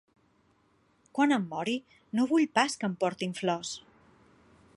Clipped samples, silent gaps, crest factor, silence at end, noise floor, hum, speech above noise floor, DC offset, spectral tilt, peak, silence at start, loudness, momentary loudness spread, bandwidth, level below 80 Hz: under 0.1%; none; 22 dB; 1 s; -68 dBFS; none; 39 dB; under 0.1%; -4.5 dB/octave; -10 dBFS; 1.15 s; -30 LUFS; 11 LU; 11.5 kHz; -74 dBFS